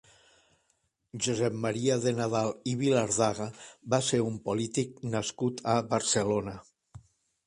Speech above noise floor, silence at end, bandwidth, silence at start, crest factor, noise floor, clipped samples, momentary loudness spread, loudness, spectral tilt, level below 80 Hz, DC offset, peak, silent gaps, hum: 46 dB; 0.5 s; 11.5 kHz; 1.15 s; 20 dB; -75 dBFS; under 0.1%; 8 LU; -29 LUFS; -4.5 dB/octave; -62 dBFS; under 0.1%; -12 dBFS; none; none